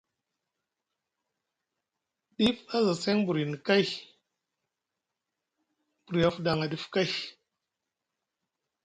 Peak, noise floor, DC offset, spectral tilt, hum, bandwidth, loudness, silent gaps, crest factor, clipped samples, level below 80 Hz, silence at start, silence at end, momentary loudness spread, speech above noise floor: -10 dBFS; -87 dBFS; under 0.1%; -5.5 dB/octave; none; 11 kHz; -28 LUFS; none; 22 dB; under 0.1%; -64 dBFS; 2.4 s; 1.55 s; 7 LU; 59 dB